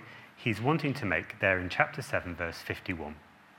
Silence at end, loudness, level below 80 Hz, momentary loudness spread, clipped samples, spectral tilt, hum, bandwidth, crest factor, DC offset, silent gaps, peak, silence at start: 0.35 s; -31 LUFS; -62 dBFS; 11 LU; under 0.1%; -6 dB/octave; none; 17 kHz; 24 dB; under 0.1%; none; -10 dBFS; 0 s